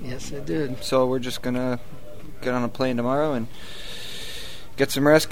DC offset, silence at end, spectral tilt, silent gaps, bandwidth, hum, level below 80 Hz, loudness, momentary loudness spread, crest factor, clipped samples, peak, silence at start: 3%; 0 s; -5 dB/octave; none; 16 kHz; none; -44 dBFS; -25 LUFS; 15 LU; 22 dB; under 0.1%; -4 dBFS; 0 s